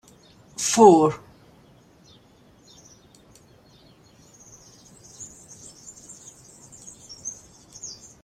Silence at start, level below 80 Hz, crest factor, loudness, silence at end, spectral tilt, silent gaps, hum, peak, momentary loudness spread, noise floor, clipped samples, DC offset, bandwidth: 0.6 s; -64 dBFS; 24 dB; -19 LUFS; 0.3 s; -4.5 dB/octave; none; none; -2 dBFS; 29 LU; -55 dBFS; under 0.1%; under 0.1%; 14.5 kHz